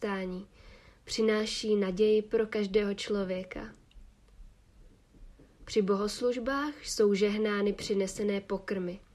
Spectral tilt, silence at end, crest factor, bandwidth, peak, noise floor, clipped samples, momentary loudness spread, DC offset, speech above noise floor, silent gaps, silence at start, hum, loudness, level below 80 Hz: -5 dB/octave; 0.15 s; 16 dB; 13 kHz; -16 dBFS; -58 dBFS; under 0.1%; 10 LU; under 0.1%; 28 dB; none; 0 s; none; -30 LUFS; -56 dBFS